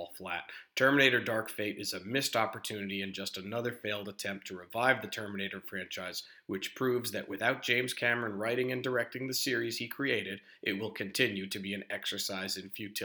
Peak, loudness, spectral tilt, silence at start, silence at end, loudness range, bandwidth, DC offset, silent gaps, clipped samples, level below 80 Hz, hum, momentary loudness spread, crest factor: -8 dBFS; -33 LUFS; -3.5 dB/octave; 0 s; 0 s; 4 LU; over 20 kHz; under 0.1%; none; under 0.1%; -80 dBFS; none; 10 LU; 26 dB